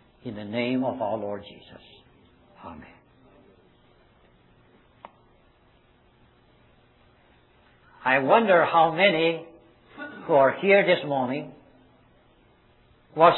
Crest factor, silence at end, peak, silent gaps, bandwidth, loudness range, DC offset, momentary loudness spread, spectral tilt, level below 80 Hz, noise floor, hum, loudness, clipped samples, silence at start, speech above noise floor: 22 dB; 0 s; -4 dBFS; none; 4.2 kHz; 14 LU; under 0.1%; 25 LU; -8.5 dB/octave; -66 dBFS; -60 dBFS; none; -22 LUFS; under 0.1%; 0.25 s; 37 dB